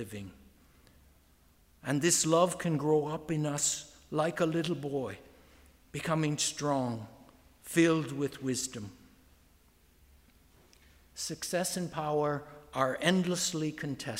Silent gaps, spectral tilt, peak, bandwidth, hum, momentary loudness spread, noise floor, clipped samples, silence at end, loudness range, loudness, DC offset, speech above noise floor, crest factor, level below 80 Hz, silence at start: none; -4 dB/octave; -12 dBFS; 16 kHz; none; 16 LU; -64 dBFS; under 0.1%; 0 s; 9 LU; -31 LUFS; under 0.1%; 33 dB; 20 dB; -64 dBFS; 0 s